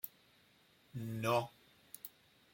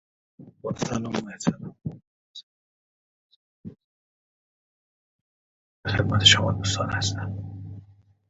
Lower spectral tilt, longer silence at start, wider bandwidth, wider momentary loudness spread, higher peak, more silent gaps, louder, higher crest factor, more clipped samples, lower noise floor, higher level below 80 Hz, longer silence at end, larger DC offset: first, -5.5 dB/octave vs -3.5 dB/octave; second, 0.05 s vs 0.4 s; first, 16.5 kHz vs 8 kHz; second, 17 LU vs 29 LU; second, -20 dBFS vs -2 dBFS; second, none vs 2.07-2.34 s, 2.43-3.30 s, 3.36-3.64 s, 3.84-5.84 s; second, -41 LUFS vs -23 LUFS; about the same, 22 dB vs 26 dB; neither; first, -69 dBFS vs -53 dBFS; second, -78 dBFS vs -48 dBFS; about the same, 0.45 s vs 0.45 s; neither